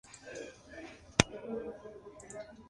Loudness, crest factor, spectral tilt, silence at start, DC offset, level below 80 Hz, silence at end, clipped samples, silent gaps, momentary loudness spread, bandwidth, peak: -35 LUFS; 38 dB; -3.5 dB/octave; 0.05 s; under 0.1%; -56 dBFS; 0 s; under 0.1%; none; 19 LU; 11.5 kHz; -2 dBFS